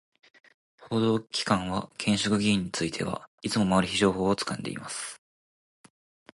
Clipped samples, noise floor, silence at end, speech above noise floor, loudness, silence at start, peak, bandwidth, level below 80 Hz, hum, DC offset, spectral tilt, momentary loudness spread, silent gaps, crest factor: under 0.1%; under -90 dBFS; 1.2 s; over 63 dB; -27 LUFS; 0.8 s; -10 dBFS; 11.5 kHz; -56 dBFS; none; under 0.1%; -4.5 dB/octave; 10 LU; 3.27-3.38 s; 20 dB